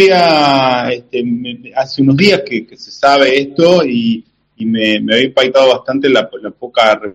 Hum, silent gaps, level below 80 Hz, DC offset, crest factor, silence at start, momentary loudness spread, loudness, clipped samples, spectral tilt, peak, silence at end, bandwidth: none; none; -52 dBFS; under 0.1%; 12 dB; 0 s; 12 LU; -12 LUFS; 0.4%; -5.5 dB/octave; 0 dBFS; 0 s; 11 kHz